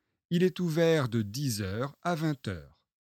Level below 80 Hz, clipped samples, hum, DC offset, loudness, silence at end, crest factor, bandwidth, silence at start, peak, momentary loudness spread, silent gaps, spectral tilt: -64 dBFS; under 0.1%; none; under 0.1%; -30 LUFS; 0.35 s; 16 dB; 16.5 kHz; 0.3 s; -14 dBFS; 10 LU; none; -6 dB/octave